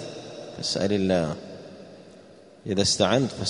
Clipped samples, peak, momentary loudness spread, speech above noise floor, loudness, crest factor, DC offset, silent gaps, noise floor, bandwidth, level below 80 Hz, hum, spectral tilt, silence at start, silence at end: under 0.1%; -6 dBFS; 22 LU; 26 dB; -24 LUFS; 22 dB; under 0.1%; none; -50 dBFS; 11 kHz; -56 dBFS; none; -4 dB/octave; 0 s; 0 s